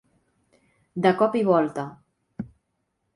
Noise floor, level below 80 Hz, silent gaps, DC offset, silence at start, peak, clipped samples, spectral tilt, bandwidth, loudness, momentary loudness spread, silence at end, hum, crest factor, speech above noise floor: -76 dBFS; -64 dBFS; none; under 0.1%; 0.95 s; -6 dBFS; under 0.1%; -7.5 dB/octave; 11.5 kHz; -22 LUFS; 19 LU; 0.7 s; none; 22 dB; 54 dB